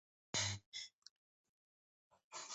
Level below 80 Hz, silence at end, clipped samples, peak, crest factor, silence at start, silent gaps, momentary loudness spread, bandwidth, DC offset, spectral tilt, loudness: -72 dBFS; 0 s; under 0.1%; -26 dBFS; 24 dB; 0.35 s; 0.66-0.72 s, 0.93-1.02 s, 1.10-2.10 s, 2.24-2.31 s; 15 LU; 8.2 kHz; under 0.1%; -1.5 dB/octave; -43 LUFS